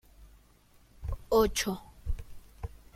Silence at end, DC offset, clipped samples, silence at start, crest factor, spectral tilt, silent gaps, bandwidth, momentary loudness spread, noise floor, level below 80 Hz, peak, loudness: 0.3 s; under 0.1%; under 0.1%; 0.2 s; 20 dB; -4 dB/octave; none; 16.5 kHz; 19 LU; -61 dBFS; -42 dBFS; -14 dBFS; -31 LUFS